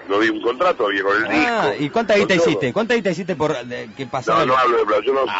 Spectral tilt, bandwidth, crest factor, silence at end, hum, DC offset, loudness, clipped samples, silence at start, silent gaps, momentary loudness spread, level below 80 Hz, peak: -5 dB/octave; 8 kHz; 12 dB; 0 s; none; under 0.1%; -18 LUFS; under 0.1%; 0 s; none; 7 LU; -54 dBFS; -6 dBFS